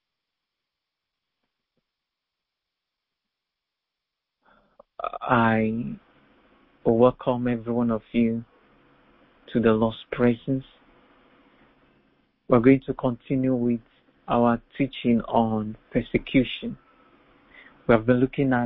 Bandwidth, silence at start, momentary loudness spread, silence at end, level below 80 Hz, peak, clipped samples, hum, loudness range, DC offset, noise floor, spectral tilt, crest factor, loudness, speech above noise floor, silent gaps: 4.1 kHz; 5 s; 12 LU; 0 s; -52 dBFS; -4 dBFS; under 0.1%; none; 4 LU; under 0.1%; -85 dBFS; -11.5 dB/octave; 22 dB; -24 LUFS; 63 dB; none